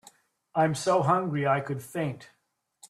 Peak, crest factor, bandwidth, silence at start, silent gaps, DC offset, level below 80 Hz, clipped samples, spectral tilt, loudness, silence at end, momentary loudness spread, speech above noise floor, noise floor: -10 dBFS; 18 dB; 14.5 kHz; 0.55 s; none; under 0.1%; -68 dBFS; under 0.1%; -6 dB/octave; -27 LUFS; 0.05 s; 10 LU; 35 dB; -61 dBFS